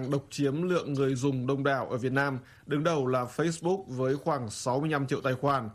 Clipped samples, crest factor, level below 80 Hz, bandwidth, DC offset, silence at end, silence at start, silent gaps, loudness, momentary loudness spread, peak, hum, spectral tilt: under 0.1%; 18 dB; -64 dBFS; 13.5 kHz; under 0.1%; 0 s; 0 s; none; -29 LUFS; 4 LU; -12 dBFS; none; -6 dB/octave